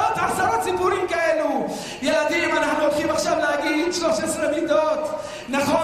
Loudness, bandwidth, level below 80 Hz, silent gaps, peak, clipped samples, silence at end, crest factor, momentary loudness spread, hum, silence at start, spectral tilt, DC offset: -22 LUFS; 15.5 kHz; -52 dBFS; none; -6 dBFS; under 0.1%; 0 s; 14 dB; 6 LU; none; 0 s; -3.5 dB/octave; under 0.1%